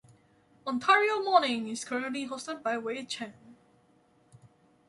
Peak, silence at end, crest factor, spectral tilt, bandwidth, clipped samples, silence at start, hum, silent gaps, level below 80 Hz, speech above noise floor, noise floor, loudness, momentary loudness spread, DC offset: -8 dBFS; 1.35 s; 24 dB; -2.5 dB/octave; 11.5 kHz; under 0.1%; 0.65 s; none; none; -78 dBFS; 36 dB; -65 dBFS; -29 LUFS; 14 LU; under 0.1%